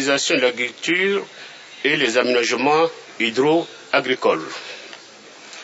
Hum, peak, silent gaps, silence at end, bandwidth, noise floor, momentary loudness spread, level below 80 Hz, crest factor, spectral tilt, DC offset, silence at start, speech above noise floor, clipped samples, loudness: none; -4 dBFS; none; 0 s; 8 kHz; -43 dBFS; 19 LU; -76 dBFS; 18 dB; -3 dB/octave; under 0.1%; 0 s; 23 dB; under 0.1%; -19 LUFS